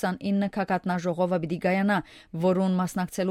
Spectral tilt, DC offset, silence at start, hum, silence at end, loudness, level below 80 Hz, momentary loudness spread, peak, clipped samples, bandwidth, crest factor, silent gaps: -7 dB/octave; under 0.1%; 0 s; none; 0 s; -26 LUFS; -60 dBFS; 5 LU; -12 dBFS; under 0.1%; 14 kHz; 14 dB; none